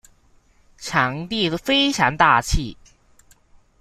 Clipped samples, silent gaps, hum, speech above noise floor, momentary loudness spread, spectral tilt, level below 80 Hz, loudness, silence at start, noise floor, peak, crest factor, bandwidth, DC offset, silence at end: under 0.1%; none; none; 37 dB; 10 LU; -3.5 dB/octave; -34 dBFS; -19 LUFS; 0.8 s; -56 dBFS; -2 dBFS; 20 dB; 15.5 kHz; under 0.1%; 1.1 s